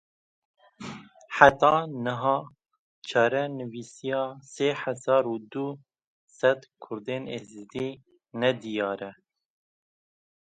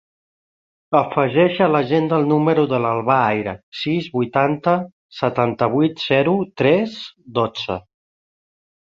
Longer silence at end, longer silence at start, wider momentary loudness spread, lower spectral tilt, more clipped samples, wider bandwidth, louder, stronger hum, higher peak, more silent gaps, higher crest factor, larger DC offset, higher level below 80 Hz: first, 1.4 s vs 1.2 s; about the same, 0.8 s vs 0.9 s; first, 19 LU vs 10 LU; second, -5 dB/octave vs -8 dB/octave; neither; first, 9.2 kHz vs 7.4 kHz; second, -26 LUFS vs -19 LUFS; neither; about the same, 0 dBFS vs -2 dBFS; first, 2.79-3.02 s, 6.07-6.27 s vs 3.63-3.72 s, 4.93-5.09 s; first, 28 dB vs 18 dB; neither; second, -64 dBFS vs -56 dBFS